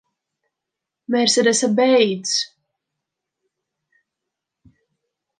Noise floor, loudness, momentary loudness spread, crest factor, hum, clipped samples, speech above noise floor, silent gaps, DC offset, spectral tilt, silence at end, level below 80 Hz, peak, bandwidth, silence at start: -84 dBFS; -17 LUFS; 8 LU; 18 dB; none; under 0.1%; 67 dB; none; under 0.1%; -3 dB/octave; 2.95 s; -74 dBFS; -4 dBFS; 10 kHz; 1.1 s